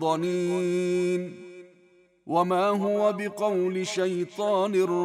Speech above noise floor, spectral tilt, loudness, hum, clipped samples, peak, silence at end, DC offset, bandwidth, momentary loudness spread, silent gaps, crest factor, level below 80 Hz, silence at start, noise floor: 35 dB; -6 dB/octave; -26 LUFS; none; under 0.1%; -12 dBFS; 0 s; under 0.1%; 13.5 kHz; 5 LU; none; 14 dB; -78 dBFS; 0 s; -60 dBFS